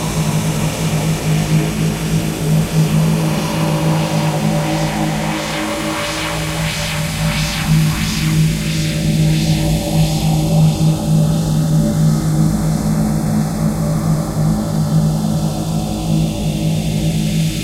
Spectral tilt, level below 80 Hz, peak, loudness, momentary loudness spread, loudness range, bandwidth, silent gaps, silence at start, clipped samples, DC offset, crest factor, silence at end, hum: -5.5 dB/octave; -30 dBFS; -2 dBFS; -16 LUFS; 4 LU; 3 LU; 16 kHz; none; 0 s; under 0.1%; under 0.1%; 12 dB; 0 s; none